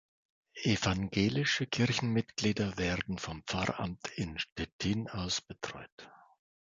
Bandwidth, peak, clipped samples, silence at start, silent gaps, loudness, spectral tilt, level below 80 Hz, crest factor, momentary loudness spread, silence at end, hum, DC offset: 9.2 kHz; -14 dBFS; under 0.1%; 0.55 s; 4.52-4.56 s, 4.72-4.79 s, 5.92-5.98 s; -33 LUFS; -4.5 dB/octave; -54 dBFS; 20 dB; 10 LU; 0.55 s; none; under 0.1%